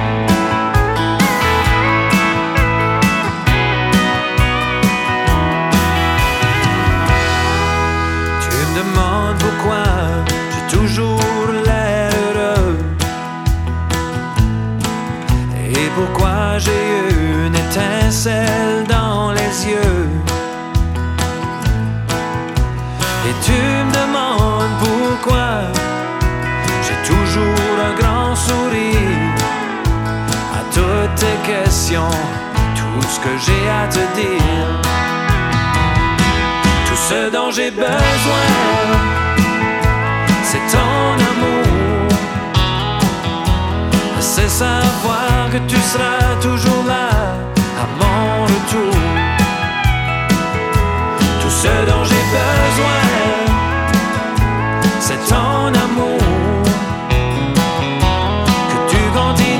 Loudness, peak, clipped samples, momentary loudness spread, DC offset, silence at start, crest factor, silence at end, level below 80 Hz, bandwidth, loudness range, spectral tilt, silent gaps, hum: -15 LUFS; 0 dBFS; under 0.1%; 5 LU; under 0.1%; 0 s; 14 dB; 0 s; -24 dBFS; 18 kHz; 3 LU; -5 dB/octave; none; none